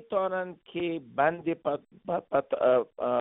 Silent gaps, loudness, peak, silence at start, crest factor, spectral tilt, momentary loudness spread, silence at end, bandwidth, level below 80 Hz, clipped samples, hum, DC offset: none; -29 LUFS; -10 dBFS; 0 s; 18 dB; -4.5 dB/octave; 9 LU; 0 s; 4 kHz; -68 dBFS; under 0.1%; none; under 0.1%